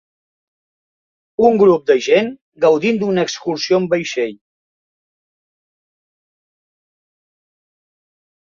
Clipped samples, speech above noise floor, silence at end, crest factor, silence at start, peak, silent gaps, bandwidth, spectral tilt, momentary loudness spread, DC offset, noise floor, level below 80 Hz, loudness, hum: under 0.1%; over 75 dB; 4.15 s; 18 dB; 1.4 s; 0 dBFS; 2.41-2.52 s; 7.4 kHz; -5 dB/octave; 10 LU; under 0.1%; under -90 dBFS; -62 dBFS; -16 LUFS; none